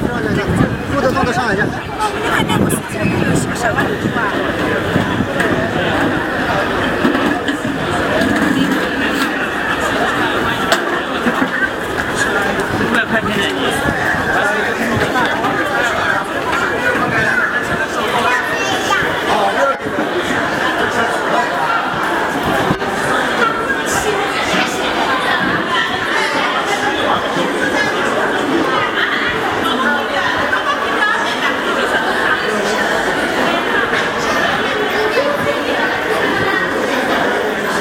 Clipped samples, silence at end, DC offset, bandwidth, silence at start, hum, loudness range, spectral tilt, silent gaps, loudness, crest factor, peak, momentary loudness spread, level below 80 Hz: under 0.1%; 0 s; under 0.1%; 16.5 kHz; 0 s; none; 1 LU; -4 dB/octave; none; -15 LUFS; 16 dB; 0 dBFS; 2 LU; -40 dBFS